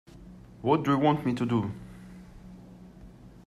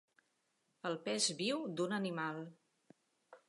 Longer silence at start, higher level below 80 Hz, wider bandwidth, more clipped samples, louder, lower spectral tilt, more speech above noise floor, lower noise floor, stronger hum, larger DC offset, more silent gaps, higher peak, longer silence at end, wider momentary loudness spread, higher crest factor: second, 0.15 s vs 0.85 s; first, -56 dBFS vs under -90 dBFS; first, 13.5 kHz vs 11.5 kHz; neither; first, -27 LUFS vs -38 LUFS; first, -8 dB/octave vs -3 dB/octave; second, 24 dB vs 43 dB; second, -49 dBFS vs -81 dBFS; first, 60 Hz at -55 dBFS vs none; neither; neither; first, -10 dBFS vs -22 dBFS; about the same, 0.2 s vs 0.1 s; first, 25 LU vs 12 LU; about the same, 20 dB vs 20 dB